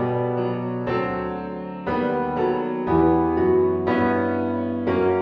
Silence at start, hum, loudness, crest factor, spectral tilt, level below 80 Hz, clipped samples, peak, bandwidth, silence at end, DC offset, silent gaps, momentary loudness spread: 0 s; none; -22 LUFS; 14 dB; -10 dB/octave; -46 dBFS; under 0.1%; -8 dBFS; 5.2 kHz; 0 s; under 0.1%; none; 8 LU